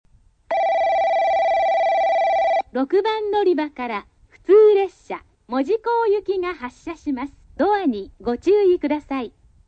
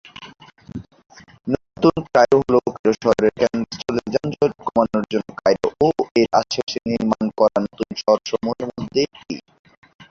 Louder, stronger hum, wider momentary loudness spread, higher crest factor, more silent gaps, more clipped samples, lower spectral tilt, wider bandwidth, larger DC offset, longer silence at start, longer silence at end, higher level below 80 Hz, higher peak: about the same, -20 LUFS vs -20 LUFS; neither; about the same, 14 LU vs 16 LU; about the same, 14 dB vs 18 dB; second, none vs 2.79-2.84 s, 6.11-6.15 s, 6.63-6.67 s, 9.59-9.65 s, 9.77-9.82 s, 9.94-9.99 s; neither; about the same, -5.5 dB/octave vs -5.5 dB/octave; about the same, 7.8 kHz vs 7.6 kHz; neither; first, 0.5 s vs 0.2 s; first, 0.4 s vs 0.1 s; about the same, -54 dBFS vs -52 dBFS; second, -6 dBFS vs -2 dBFS